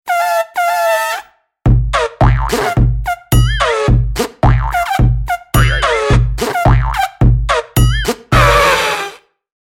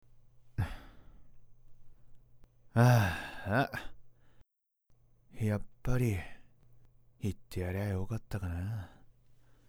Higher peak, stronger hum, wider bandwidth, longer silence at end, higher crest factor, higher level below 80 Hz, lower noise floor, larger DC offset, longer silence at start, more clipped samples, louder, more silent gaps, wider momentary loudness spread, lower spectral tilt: first, 0 dBFS vs -12 dBFS; neither; about the same, 18 kHz vs 16.5 kHz; second, 0.45 s vs 0.8 s; second, 12 dB vs 24 dB; first, -18 dBFS vs -50 dBFS; second, -32 dBFS vs -72 dBFS; neither; about the same, 0.05 s vs 0.15 s; neither; first, -13 LUFS vs -34 LUFS; neither; second, 6 LU vs 17 LU; second, -5 dB/octave vs -7 dB/octave